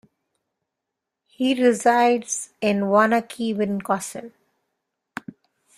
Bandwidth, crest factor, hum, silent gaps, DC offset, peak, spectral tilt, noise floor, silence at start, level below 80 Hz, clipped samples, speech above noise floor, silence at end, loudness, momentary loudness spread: 15 kHz; 20 dB; none; none; under 0.1%; -4 dBFS; -4.5 dB/octave; -83 dBFS; 1.4 s; -68 dBFS; under 0.1%; 62 dB; 1.5 s; -21 LUFS; 20 LU